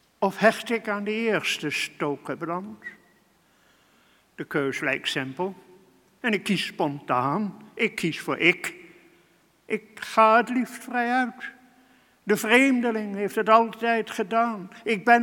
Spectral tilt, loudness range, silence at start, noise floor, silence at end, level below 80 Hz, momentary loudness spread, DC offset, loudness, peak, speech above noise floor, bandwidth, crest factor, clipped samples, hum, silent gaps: -4.5 dB/octave; 8 LU; 0.2 s; -62 dBFS; 0 s; -72 dBFS; 13 LU; under 0.1%; -24 LUFS; -2 dBFS; 38 dB; 18 kHz; 24 dB; under 0.1%; none; none